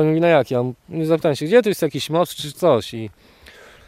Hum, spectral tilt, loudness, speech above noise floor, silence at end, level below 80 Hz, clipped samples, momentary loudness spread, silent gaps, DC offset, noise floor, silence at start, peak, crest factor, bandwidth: none; -6 dB/octave; -19 LUFS; 27 dB; 0.8 s; -58 dBFS; under 0.1%; 10 LU; none; under 0.1%; -45 dBFS; 0 s; -2 dBFS; 18 dB; 16 kHz